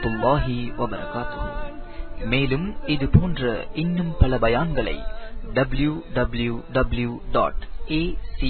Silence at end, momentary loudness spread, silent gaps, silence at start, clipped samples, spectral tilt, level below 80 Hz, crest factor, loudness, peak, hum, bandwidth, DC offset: 0 s; 14 LU; none; 0 s; under 0.1%; -11.5 dB/octave; -30 dBFS; 20 dB; -24 LUFS; -2 dBFS; none; 4.5 kHz; under 0.1%